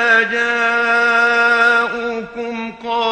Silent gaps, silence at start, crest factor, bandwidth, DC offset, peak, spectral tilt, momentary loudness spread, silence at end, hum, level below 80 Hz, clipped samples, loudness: none; 0 s; 14 dB; 9.2 kHz; under 0.1%; 0 dBFS; -2.5 dB/octave; 13 LU; 0 s; none; -56 dBFS; under 0.1%; -14 LUFS